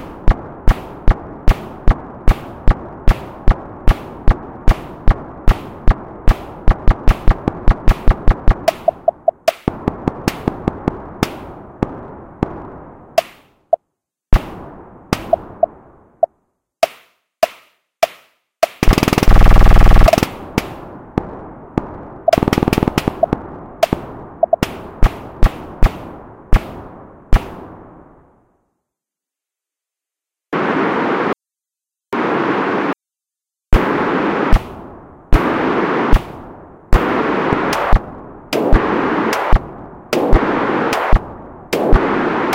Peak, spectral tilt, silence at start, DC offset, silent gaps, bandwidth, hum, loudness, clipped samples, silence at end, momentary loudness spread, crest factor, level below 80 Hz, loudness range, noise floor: 0 dBFS; -6.5 dB/octave; 0 s; under 0.1%; none; 16.5 kHz; none; -18 LUFS; 1%; 0 s; 17 LU; 16 dB; -18 dBFS; 7 LU; -87 dBFS